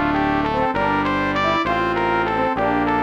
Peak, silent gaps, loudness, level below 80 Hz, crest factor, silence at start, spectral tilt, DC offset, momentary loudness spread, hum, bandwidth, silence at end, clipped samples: -8 dBFS; none; -19 LUFS; -40 dBFS; 12 dB; 0 s; -6.5 dB/octave; under 0.1%; 1 LU; none; 8.8 kHz; 0 s; under 0.1%